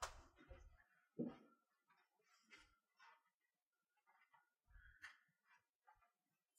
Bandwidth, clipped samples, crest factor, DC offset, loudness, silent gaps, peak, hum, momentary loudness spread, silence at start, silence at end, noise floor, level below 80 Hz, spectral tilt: 9.4 kHz; under 0.1%; 28 dB; under 0.1%; -58 LUFS; 3.35-3.40 s, 3.67-3.71 s, 5.75-5.80 s; -34 dBFS; none; 16 LU; 0 s; 0.5 s; under -90 dBFS; -74 dBFS; -4 dB/octave